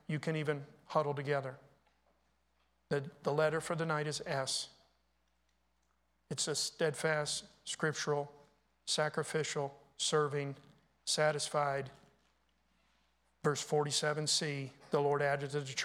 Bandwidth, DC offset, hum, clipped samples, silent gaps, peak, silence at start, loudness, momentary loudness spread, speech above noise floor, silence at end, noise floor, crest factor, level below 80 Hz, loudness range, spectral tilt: 15.5 kHz; under 0.1%; none; under 0.1%; none; -18 dBFS; 0.1 s; -35 LUFS; 11 LU; 42 dB; 0 s; -78 dBFS; 20 dB; -76 dBFS; 3 LU; -3.5 dB/octave